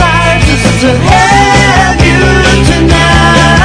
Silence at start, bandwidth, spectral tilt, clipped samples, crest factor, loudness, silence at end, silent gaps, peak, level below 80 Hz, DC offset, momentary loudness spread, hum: 0 s; 11 kHz; -4.5 dB/octave; 10%; 6 dB; -6 LUFS; 0 s; none; 0 dBFS; -14 dBFS; under 0.1%; 3 LU; none